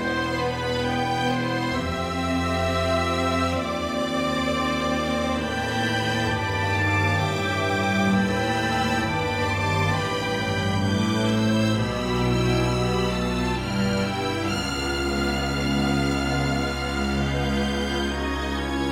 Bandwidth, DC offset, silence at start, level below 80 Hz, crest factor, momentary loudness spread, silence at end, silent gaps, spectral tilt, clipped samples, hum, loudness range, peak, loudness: 16 kHz; under 0.1%; 0 s; -36 dBFS; 14 dB; 4 LU; 0 s; none; -5.5 dB/octave; under 0.1%; none; 2 LU; -10 dBFS; -24 LUFS